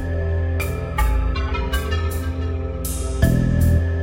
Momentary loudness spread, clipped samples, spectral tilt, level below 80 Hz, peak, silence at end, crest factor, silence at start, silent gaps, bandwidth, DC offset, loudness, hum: 7 LU; under 0.1%; -6 dB/octave; -24 dBFS; -4 dBFS; 0 s; 16 dB; 0 s; none; 16.5 kHz; under 0.1%; -22 LUFS; none